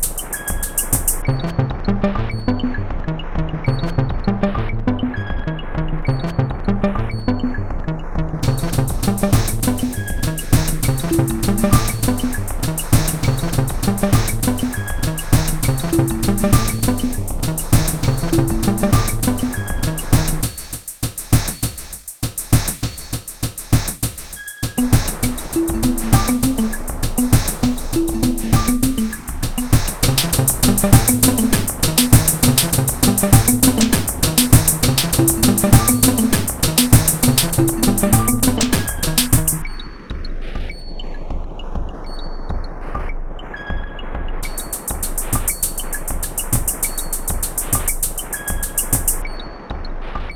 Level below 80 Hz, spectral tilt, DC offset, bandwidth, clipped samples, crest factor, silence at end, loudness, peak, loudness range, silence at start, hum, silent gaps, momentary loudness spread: -24 dBFS; -4.5 dB/octave; under 0.1%; over 20 kHz; under 0.1%; 18 dB; 0 s; -18 LUFS; 0 dBFS; 8 LU; 0 s; none; none; 15 LU